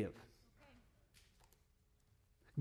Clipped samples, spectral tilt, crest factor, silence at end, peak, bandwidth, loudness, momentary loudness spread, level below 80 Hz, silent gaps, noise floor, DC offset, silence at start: under 0.1%; -7.5 dB/octave; 22 dB; 0 s; -28 dBFS; 15 kHz; -50 LUFS; 21 LU; -72 dBFS; none; -75 dBFS; under 0.1%; 0 s